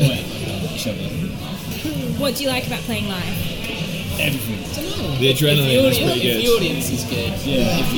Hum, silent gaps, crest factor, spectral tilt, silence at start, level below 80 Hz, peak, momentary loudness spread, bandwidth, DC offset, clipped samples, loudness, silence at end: none; none; 16 dB; -4.5 dB/octave; 0 s; -38 dBFS; -4 dBFS; 10 LU; 19 kHz; under 0.1%; under 0.1%; -20 LUFS; 0 s